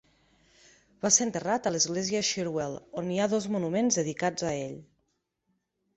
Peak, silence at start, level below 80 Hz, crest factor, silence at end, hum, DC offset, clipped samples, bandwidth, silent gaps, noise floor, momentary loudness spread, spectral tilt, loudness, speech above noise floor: -8 dBFS; 1.05 s; -66 dBFS; 22 dB; 1.15 s; none; under 0.1%; under 0.1%; 8.4 kHz; none; -78 dBFS; 12 LU; -3 dB/octave; -28 LUFS; 49 dB